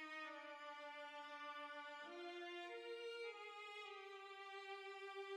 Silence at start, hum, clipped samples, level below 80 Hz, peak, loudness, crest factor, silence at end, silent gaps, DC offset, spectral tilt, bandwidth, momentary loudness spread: 0 s; none; under 0.1%; under -90 dBFS; -42 dBFS; -53 LUFS; 12 dB; 0 s; none; under 0.1%; -0.5 dB/octave; 13 kHz; 3 LU